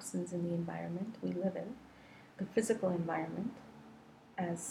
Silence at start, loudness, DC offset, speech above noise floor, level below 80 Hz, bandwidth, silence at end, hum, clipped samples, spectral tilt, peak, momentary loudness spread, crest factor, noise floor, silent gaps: 0 s; -38 LUFS; under 0.1%; 21 dB; -72 dBFS; 13 kHz; 0 s; none; under 0.1%; -6 dB/octave; -18 dBFS; 22 LU; 20 dB; -58 dBFS; none